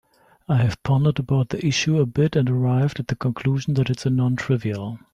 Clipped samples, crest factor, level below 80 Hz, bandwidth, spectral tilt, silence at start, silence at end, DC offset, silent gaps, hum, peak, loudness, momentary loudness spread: under 0.1%; 14 dB; -50 dBFS; 8.6 kHz; -6.5 dB/octave; 0.5 s; 0.15 s; under 0.1%; none; none; -8 dBFS; -22 LUFS; 4 LU